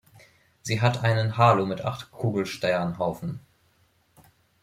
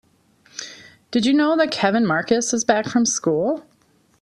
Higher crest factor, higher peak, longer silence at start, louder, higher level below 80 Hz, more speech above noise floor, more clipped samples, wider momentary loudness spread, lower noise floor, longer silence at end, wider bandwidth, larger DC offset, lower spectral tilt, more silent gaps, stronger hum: about the same, 20 dB vs 18 dB; second, -6 dBFS vs -2 dBFS; about the same, 0.65 s vs 0.55 s; second, -25 LUFS vs -19 LUFS; about the same, -60 dBFS vs -62 dBFS; about the same, 41 dB vs 41 dB; neither; about the same, 15 LU vs 17 LU; first, -65 dBFS vs -60 dBFS; first, 1.25 s vs 0.6 s; first, 14.5 kHz vs 11.5 kHz; neither; first, -6 dB/octave vs -3.5 dB/octave; neither; neither